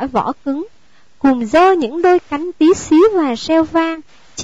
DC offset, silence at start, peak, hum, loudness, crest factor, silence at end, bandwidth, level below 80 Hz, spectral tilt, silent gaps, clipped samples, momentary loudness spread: 0.7%; 0 s; -4 dBFS; none; -14 LUFS; 10 dB; 0 s; 8 kHz; -48 dBFS; -4.5 dB/octave; none; under 0.1%; 12 LU